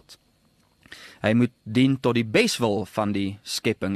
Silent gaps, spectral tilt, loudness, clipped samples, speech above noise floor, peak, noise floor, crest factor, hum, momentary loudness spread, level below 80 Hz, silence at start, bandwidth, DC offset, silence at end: none; -5.5 dB/octave; -23 LUFS; under 0.1%; 40 dB; -4 dBFS; -63 dBFS; 20 dB; none; 8 LU; -60 dBFS; 0.1 s; 13 kHz; under 0.1%; 0 s